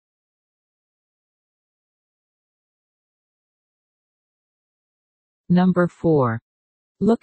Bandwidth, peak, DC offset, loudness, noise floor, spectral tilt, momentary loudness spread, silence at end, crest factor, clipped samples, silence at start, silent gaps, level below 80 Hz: 8.4 kHz; -6 dBFS; under 0.1%; -20 LUFS; under -90 dBFS; -9.5 dB/octave; 6 LU; 0.05 s; 20 dB; under 0.1%; 5.5 s; 6.42-6.95 s; -60 dBFS